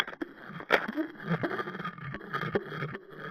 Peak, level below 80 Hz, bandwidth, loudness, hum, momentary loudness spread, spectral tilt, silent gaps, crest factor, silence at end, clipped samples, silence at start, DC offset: -6 dBFS; -66 dBFS; 14.5 kHz; -34 LUFS; none; 13 LU; -6.5 dB/octave; none; 28 dB; 0 s; under 0.1%; 0 s; under 0.1%